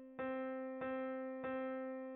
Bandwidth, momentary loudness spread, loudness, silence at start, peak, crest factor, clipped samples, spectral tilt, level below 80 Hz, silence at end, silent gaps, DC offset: 4 kHz; 2 LU; -44 LUFS; 0 s; -32 dBFS; 12 dB; under 0.1%; -4.5 dB/octave; -80 dBFS; 0 s; none; under 0.1%